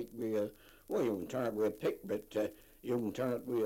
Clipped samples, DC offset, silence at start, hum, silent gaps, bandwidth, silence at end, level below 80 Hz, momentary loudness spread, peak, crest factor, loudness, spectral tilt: under 0.1%; under 0.1%; 0 s; none; none; 16.5 kHz; 0 s; -66 dBFS; 6 LU; -22 dBFS; 14 dB; -37 LUFS; -6.5 dB/octave